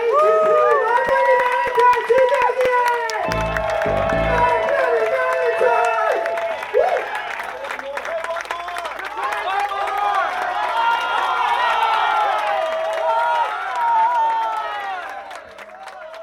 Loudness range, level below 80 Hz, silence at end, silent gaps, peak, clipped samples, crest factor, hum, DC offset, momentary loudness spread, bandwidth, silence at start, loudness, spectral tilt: 6 LU; -42 dBFS; 0 s; none; -4 dBFS; under 0.1%; 16 dB; none; under 0.1%; 11 LU; 17.5 kHz; 0 s; -19 LUFS; -4 dB/octave